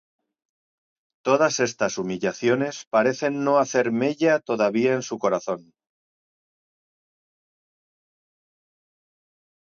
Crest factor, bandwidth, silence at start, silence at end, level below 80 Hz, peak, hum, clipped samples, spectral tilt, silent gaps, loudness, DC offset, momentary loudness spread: 20 dB; 7.6 kHz; 1.25 s; 4.05 s; -72 dBFS; -6 dBFS; none; under 0.1%; -4.5 dB/octave; 2.87-2.91 s; -23 LUFS; under 0.1%; 6 LU